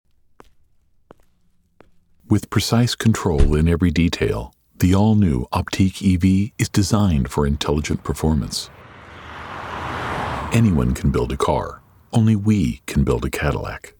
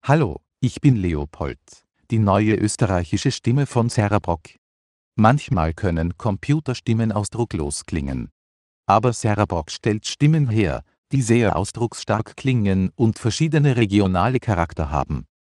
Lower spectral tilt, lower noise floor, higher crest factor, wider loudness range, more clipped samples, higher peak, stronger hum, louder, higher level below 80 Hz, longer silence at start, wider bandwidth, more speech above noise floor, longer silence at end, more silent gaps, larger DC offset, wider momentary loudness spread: about the same, -6 dB/octave vs -6.5 dB/octave; second, -59 dBFS vs under -90 dBFS; about the same, 16 dB vs 20 dB; about the same, 5 LU vs 3 LU; neither; about the same, -2 dBFS vs 0 dBFS; neither; about the same, -20 LUFS vs -21 LUFS; first, -30 dBFS vs -40 dBFS; first, 2.3 s vs 0.05 s; first, 19.5 kHz vs 11.5 kHz; second, 41 dB vs over 70 dB; second, 0.1 s vs 0.3 s; second, none vs 4.58-5.12 s, 8.32-8.83 s, 10.98-11.03 s; neither; about the same, 11 LU vs 9 LU